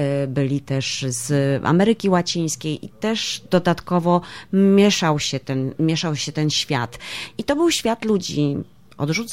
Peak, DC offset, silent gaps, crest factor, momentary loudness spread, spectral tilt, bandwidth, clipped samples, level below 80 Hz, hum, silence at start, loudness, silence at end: -4 dBFS; 0.3%; none; 18 dB; 9 LU; -5 dB/octave; 16 kHz; under 0.1%; -54 dBFS; none; 0 s; -20 LUFS; 0 s